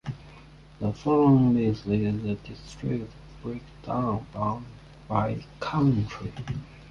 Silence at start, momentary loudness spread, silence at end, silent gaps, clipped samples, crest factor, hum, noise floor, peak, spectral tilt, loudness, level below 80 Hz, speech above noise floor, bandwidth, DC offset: 0.05 s; 18 LU; 0 s; none; under 0.1%; 18 dB; none; -49 dBFS; -10 dBFS; -9 dB/octave; -27 LUFS; -50 dBFS; 23 dB; 8 kHz; under 0.1%